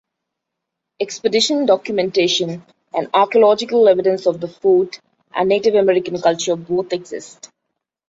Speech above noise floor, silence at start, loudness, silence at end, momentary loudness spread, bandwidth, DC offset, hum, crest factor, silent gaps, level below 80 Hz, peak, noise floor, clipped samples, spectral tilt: 63 dB; 1 s; -17 LUFS; 0.8 s; 13 LU; 8 kHz; under 0.1%; none; 16 dB; none; -62 dBFS; -2 dBFS; -80 dBFS; under 0.1%; -4 dB/octave